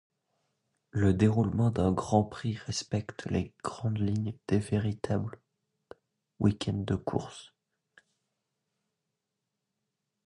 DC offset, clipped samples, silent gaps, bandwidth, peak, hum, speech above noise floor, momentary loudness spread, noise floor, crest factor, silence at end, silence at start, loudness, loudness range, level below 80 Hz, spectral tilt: under 0.1%; under 0.1%; none; 11 kHz; -10 dBFS; none; 56 dB; 10 LU; -85 dBFS; 22 dB; 2.8 s; 0.95 s; -30 LUFS; 6 LU; -50 dBFS; -7 dB/octave